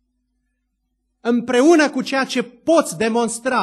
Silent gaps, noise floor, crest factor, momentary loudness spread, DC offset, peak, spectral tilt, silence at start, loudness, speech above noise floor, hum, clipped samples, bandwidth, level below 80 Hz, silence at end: none; -72 dBFS; 18 dB; 9 LU; under 0.1%; -2 dBFS; -3.5 dB/octave; 1.25 s; -18 LUFS; 55 dB; none; under 0.1%; 12.5 kHz; -64 dBFS; 0 s